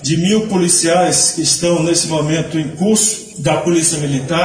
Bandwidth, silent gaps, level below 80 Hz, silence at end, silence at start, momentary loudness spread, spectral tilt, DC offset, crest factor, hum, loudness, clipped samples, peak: 10.5 kHz; none; -48 dBFS; 0 s; 0 s; 7 LU; -3.5 dB/octave; under 0.1%; 14 dB; none; -13 LUFS; under 0.1%; -2 dBFS